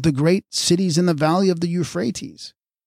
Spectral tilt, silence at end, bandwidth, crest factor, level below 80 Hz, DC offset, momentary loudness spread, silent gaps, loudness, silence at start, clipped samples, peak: -5.5 dB/octave; 0.35 s; 15 kHz; 14 dB; -52 dBFS; under 0.1%; 16 LU; none; -19 LUFS; 0 s; under 0.1%; -6 dBFS